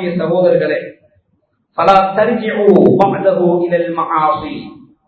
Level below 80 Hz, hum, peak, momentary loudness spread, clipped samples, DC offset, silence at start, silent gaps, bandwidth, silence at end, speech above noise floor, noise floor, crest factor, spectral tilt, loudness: -50 dBFS; none; 0 dBFS; 12 LU; 0.3%; under 0.1%; 0 s; none; 8 kHz; 0.35 s; 50 dB; -63 dBFS; 14 dB; -8.5 dB/octave; -13 LUFS